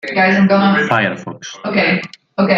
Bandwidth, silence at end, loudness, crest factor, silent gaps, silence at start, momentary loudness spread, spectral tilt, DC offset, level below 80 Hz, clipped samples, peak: 7.4 kHz; 0 s; -14 LUFS; 14 dB; none; 0.05 s; 15 LU; -6 dB/octave; under 0.1%; -58 dBFS; under 0.1%; 0 dBFS